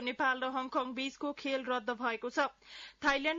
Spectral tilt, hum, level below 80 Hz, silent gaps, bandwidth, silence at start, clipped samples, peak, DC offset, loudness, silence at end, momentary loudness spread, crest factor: 0.5 dB/octave; none; -68 dBFS; none; 7.4 kHz; 0 s; under 0.1%; -18 dBFS; under 0.1%; -35 LUFS; 0 s; 6 LU; 18 dB